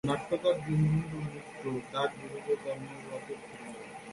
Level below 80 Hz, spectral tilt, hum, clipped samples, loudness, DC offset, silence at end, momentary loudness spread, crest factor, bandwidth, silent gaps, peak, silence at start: -60 dBFS; -7 dB/octave; none; under 0.1%; -34 LUFS; under 0.1%; 0 s; 15 LU; 18 dB; 11.5 kHz; none; -16 dBFS; 0.05 s